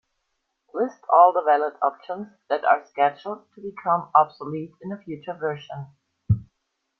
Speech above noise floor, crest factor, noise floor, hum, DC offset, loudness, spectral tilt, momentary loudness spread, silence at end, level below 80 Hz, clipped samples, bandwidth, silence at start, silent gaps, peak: 54 dB; 22 dB; -77 dBFS; none; under 0.1%; -22 LUFS; -8.5 dB/octave; 19 LU; 0.55 s; -54 dBFS; under 0.1%; 6.2 kHz; 0.75 s; none; -2 dBFS